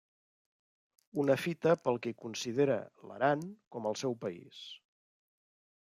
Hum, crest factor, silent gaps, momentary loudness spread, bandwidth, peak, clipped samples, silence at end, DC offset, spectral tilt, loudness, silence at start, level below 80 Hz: none; 20 dB; 3.67-3.71 s; 17 LU; 15.5 kHz; -16 dBFS; under 0.1%; 1.05 s; under 0.1%; -5.5 dB/octave; -34 LUFS; 1.15 s; -82 dBFS